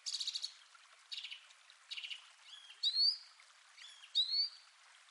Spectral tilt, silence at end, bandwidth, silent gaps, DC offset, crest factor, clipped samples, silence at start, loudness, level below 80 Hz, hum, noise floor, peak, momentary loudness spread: 9 dB/octave; 0.5 s; 11.5 kHz; none; under 0.1%; 20 dB; under 0.1%; 0.05 s; -36 LUFS; under -90 dBFS; none; -63 dBFS; -22 dBFS; 23 LU